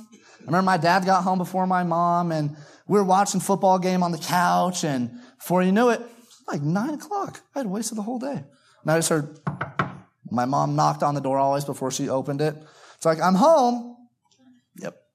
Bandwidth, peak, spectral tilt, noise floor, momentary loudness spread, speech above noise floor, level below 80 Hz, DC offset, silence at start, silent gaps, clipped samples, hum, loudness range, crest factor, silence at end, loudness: 15 kHz; -6 dBFS; -5.5 dB/octave; -58 dBFS; 13 LU; 36 dB; -72 dBFS; under 0.1%; 0 s; none; under 0.1%; none; 5 LU; 18 dB; 0.25 s; -23 LUFS